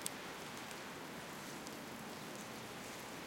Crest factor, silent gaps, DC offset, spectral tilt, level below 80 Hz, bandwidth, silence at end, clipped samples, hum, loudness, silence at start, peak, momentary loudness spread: 32 dB; none; under 0.1%; -3 dB/octave; -74 dBFS; 17 kHz; 0 s; under 0.1%; none; -48 LUFS; 0 s; -16 dBFS; 1 LU